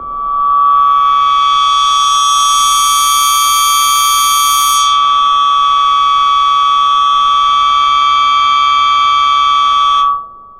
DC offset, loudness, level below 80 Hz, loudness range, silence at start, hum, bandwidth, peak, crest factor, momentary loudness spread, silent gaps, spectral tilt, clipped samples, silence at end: under 0.1%; -9 LUFS; -42 dBFS; 1 LU; 0 s; none; 16 kHz; 0 dBFS; 10 dB; 1 LU; none; 2.5 dB/octave; under 0.1%; 0.15 s